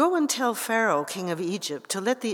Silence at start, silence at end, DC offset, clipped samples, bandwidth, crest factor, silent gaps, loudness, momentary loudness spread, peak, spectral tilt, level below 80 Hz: 0 s; 0 s; under 0.1%; under 0.1%; over 20 kHz; 18 dB; none; -26 LUFS; 7 LU; -8 dBFS; -3.5 dB/octave; under -90 dBFS